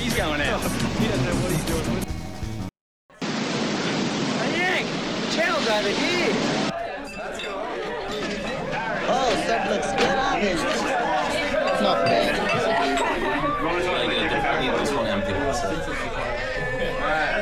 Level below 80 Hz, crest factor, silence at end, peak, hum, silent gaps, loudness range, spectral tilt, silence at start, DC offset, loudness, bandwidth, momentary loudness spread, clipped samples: -40 dBFS; 16 dB; 0 s; -8 dBFS; none; 2.81-3.09 s; 4 LU; -4 dB/octave; 0 s; under 0.1%; -24 LUFS; 17.5 kHz; 8 LU; under 0.1%